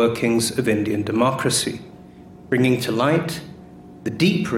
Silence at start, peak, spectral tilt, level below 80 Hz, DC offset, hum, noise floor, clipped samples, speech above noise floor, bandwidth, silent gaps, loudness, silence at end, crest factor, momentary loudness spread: 0 s; -6 dBFS; -5 dB/octave; -54 dBFS; under 0.1%; none; -42 dBFS; under 0.1%; 23 dB; 16.5 kHz; none; -20 LUFS; 0 s; 14 dB; 13 LU